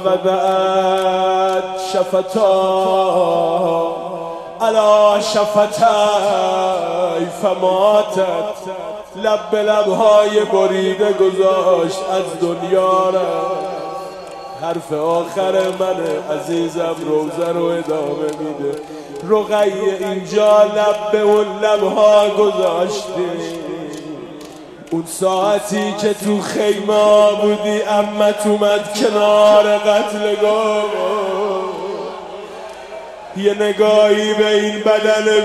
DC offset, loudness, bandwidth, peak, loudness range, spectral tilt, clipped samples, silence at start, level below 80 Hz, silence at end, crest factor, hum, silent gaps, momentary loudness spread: under 0.1%; -15 LUFS; 13.5 kHz; 0 dBFS; 6 LU; -4.5 dB/octave; under 0.1%; 0 s; -58 dBFS; 0 s; 16 dB; none; none; 15 LU